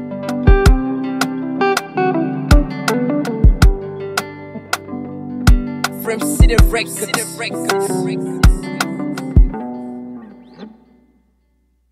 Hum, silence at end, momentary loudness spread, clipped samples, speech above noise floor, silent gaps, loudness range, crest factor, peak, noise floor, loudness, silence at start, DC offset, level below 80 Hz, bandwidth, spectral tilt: none; 1.25 s; 15 LU; under 0.1%; 45 dB; none; 4 LU; 16 dB; 0 dBFS; -60 dBFS; -17 LUFS; 0 s; under 0.1%; -18 dBFS; 16 kHz; -5.5 dB/octave